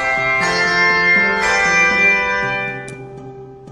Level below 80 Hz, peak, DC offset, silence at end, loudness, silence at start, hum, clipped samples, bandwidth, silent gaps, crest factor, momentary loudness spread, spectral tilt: -44 dBFS; -2 dBFS; under 0.1%; 0 s; -13 LUFS; 0 s; none; under 0.1%; 12 kHz; none; 16 dB; 20 LU; -3 dB/octave